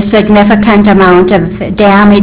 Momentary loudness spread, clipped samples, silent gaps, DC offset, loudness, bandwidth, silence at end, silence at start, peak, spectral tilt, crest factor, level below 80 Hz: 5 LU; 2%; none; under 0.1%; -5 LUFS; 4 kHz; 0 s; 0 s; 0 dBFS; -11 dB/octave; 4 dB; -28 dBFS